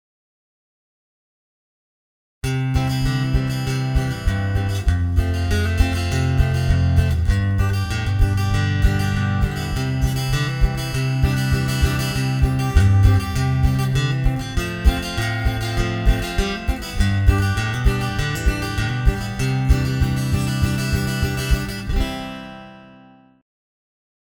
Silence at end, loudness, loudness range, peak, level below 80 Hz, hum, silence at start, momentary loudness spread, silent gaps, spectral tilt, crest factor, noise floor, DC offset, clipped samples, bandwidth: 1.4 s; -21 LUFS; 5 LU; -2 dBFS; -24 dBFS; none; 2.45 s; 5 LU; none; -6 dB/octave; 18 dB; -48 dBFS; under 0.1%; under 0.1%; 19 kHz